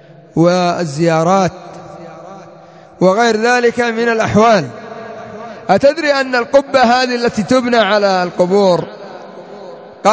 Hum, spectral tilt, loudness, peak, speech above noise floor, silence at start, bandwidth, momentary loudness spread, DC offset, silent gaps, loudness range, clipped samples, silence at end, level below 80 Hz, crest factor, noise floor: none; -5 dB/octave; -13 LUFS; 0 dBFS; 26 dB; 0.35 s; 8 kHz; 21 LU; under 0.1%; none; 3 LU; under 0.1%; 0 s; -50 dBFS; 14 dB; -39 dBFS